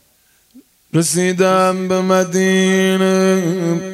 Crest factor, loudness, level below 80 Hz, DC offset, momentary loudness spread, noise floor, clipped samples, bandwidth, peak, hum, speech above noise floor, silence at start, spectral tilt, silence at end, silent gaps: 14 dB; -15 LUFS; -62 dBFS; under 0.1%; 5 LU; -56 dBFS; under 0.1%; 14 kHz; 0 dBFS; none; 41 dB; 0.55 s; -5 dB/octave; 0 s; none